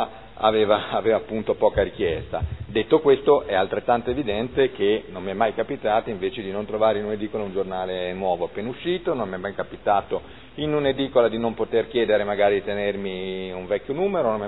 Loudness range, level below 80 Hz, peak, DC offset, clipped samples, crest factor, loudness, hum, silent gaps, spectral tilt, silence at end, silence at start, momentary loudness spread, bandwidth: 4 LU; -46 dBFS; -4 dBFS; 0.4%; under 0.1%; 18 dB; -23 LUFS; none; none; -9.5 dB/octave; 0 s; 0 s; 10 LU; 4.1 kHz